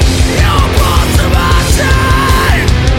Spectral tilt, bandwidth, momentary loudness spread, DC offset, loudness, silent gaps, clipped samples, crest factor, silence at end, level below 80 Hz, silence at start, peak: -4.5 dB/octave; 17 kHz; 1 LU; under 0.1%; -10 LUFS; none; under 0.1%; 8 dB; 0 s; -12 dBFS; 0 s; 0 dBFS